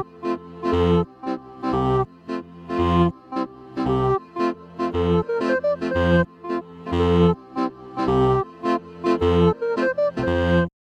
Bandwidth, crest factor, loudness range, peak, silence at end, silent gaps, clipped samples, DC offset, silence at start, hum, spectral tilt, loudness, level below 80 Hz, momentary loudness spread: 8.2 kHz; 16 dB; 3 LU; -6 dBFS; 0.15 s; none; under 0.1%; under 0.1%; 0 s; none; -8 dB/octave; -22 LUFS; -40 dBFS; 10 LU